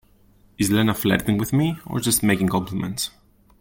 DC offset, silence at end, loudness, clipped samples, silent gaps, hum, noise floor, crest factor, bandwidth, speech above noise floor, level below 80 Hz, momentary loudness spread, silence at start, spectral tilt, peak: under 0.1%; 0.5 s; -22 LUFS; under 0.1%; none; none; -55 dBFS; 18 dB; 17 kHz; 34 dB; -48 dBFS; 8 LU; 0.6 s; -4.5 dB/octave; -6 dBFS